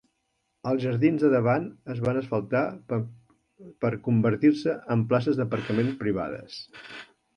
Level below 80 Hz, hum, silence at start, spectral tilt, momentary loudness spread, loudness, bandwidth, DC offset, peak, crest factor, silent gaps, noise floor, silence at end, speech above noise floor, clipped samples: -60 dBFS; none; 0.65 s; -8.5 dB/octave; 17 LU; -26 LUFS; 9.6 kHz; under 0.1%; -10 dBFS; 18 dB; none; -76 dBFS; 0.3 s; 50 dB; under 0.1%